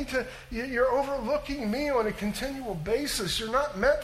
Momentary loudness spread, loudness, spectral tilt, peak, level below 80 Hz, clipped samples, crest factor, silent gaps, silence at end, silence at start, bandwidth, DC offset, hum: 8 LU; -29 LUFS; -4 dB/octave; -12 dBFS; -46 dBFS; under 0.1%; 18 dB; none; 0 s; 0 s; 16 kHz; under 0.1%; none